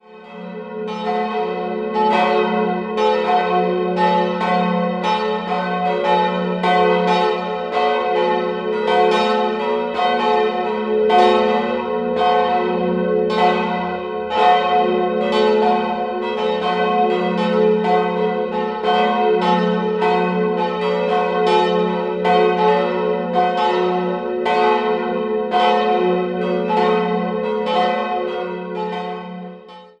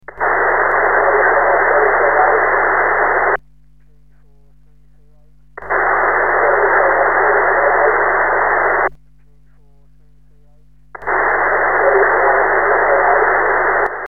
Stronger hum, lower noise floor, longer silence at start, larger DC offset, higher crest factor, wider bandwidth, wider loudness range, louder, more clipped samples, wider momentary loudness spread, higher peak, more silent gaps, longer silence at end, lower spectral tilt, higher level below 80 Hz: second, none vs 50 Hz at -45 dBFS; second, -39 dBFS vs -50 dBFS; about the same, 0.1 s vs 0 s; second, under 0.1% vs 2%; about the same, 16 dB vs 14 dB; first, 9 kHz vs 3.1 kHz; second, 1 LU vs 7 LU; second, -18 LUFS vs -13 LUFS; neither; about the same, 7 LU vs 5 LU; about the same, 0 dBFS vs 0 dBFS; neither; first, 0.15 s vs 0 s; second, -6.5 dB/octave vs -8.5 dB/octave; second, -58 dBFS vs -42 dBFS